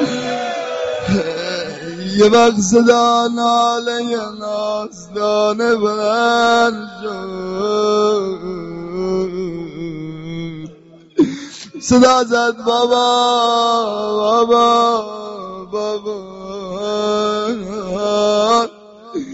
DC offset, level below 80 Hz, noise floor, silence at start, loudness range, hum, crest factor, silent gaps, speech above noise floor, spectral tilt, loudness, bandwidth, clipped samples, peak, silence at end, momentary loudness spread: under 0.1%; -50 dBFS; -42 dBFS; 0 s; 6 LU; none; 16 dB; none; 27 dB; -3 dB/octave; -16 LUFS; 8 kHz; under 0.1%; 0 dBFS; 0 s; 15 LU